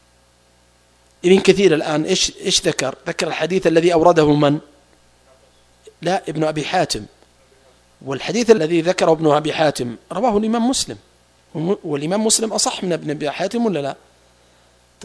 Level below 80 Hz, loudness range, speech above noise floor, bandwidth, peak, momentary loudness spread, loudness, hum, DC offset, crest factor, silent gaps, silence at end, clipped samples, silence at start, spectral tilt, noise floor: -50 dBFS; 5 LU; 38 dB; 11 kHz; 0 dBFS; 12 LU; -18 LUFS; 60 Hz at -55 dBFS; under 0.1%; 18 dB; none; 1.1 s; under 0.1%; 1.25 s; -4 dB/octave; -55 dBFS